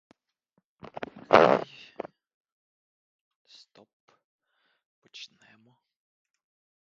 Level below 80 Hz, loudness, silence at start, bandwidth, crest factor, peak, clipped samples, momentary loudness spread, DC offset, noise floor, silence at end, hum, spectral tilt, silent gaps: -70 dBFS; -22 LUFS; 1 s; 7.4 kHz; 32 dB; 0 dBFS; under 0.1%; 26 LU; under 0.1%; -76 dBFS; 1.6 s; none; -3 dB/octave; 2.34-2.45 s, 2.52-3.45 s, 3.93-4.08 s, 4.24-4.39 s, 4.85-5.02 s